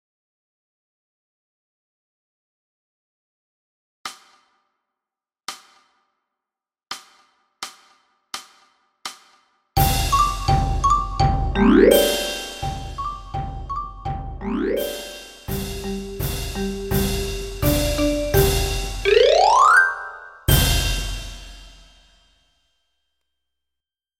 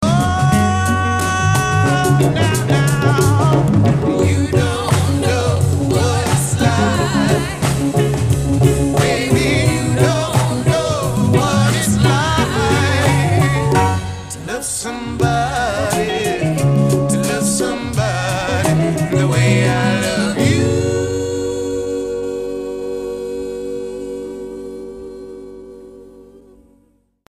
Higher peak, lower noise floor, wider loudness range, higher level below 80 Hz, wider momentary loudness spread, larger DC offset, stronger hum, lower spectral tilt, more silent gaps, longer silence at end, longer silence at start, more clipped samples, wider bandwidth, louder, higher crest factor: about the same, 0 dBFS vs 0 dBFS; first, -89 dBFS vs -57 dBFS; first, 24 LU vs 10 LU; about the same, -32 dBFS vs -34 dBFS; first, 21 LU vs 11 LU; neither; neither; about the same, -4.5 dB/octave vs -5.5 dB/octave; neither; first, 2.5 s vs 0.9 s; first, 4.05 s vs 0 s; neither; about the same, 16.5 kHz vs 15.5 kHz; second, -20 LUFS vs -16 LUFS; first, 22 dB vs 16 dB